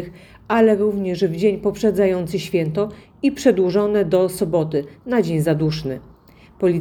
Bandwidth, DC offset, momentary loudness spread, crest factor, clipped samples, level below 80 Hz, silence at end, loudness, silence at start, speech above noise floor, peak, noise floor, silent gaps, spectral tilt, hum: 18.5 kHz; under 0.1%; 8 LU; 16 dB; under 0.1%; -50 dBFS; 0 s; -19 LUFS; 0 s; 28 dB; -2 dBFS; -47 dBFS; none; -7 dB/octave; none